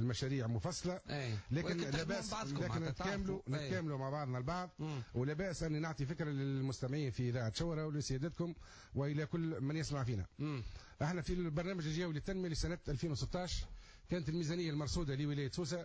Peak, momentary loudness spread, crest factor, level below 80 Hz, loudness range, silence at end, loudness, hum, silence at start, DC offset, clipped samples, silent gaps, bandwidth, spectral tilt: -28 dBFS; 4 LU; 12 dB; -54 dBFS; 1 LU; 0 s; -40 LUFS; none; 0 s; under 0.1%; under 0.1%; none; 8 kHz; -6 dB/octave